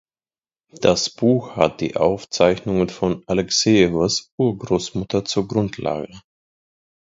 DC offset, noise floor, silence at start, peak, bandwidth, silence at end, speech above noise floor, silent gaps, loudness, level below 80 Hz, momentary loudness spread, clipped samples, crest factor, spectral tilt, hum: under 0.1%; under -90 dBFS; 0.75 s; 0 dBFS; 7.8 kHz; 1 s; over 70 dB; 4.32-4.38 s; -20 LUFS; -48 dBFS; 8 LU; under 0.1%; 20 dB; -5 dB/octave; none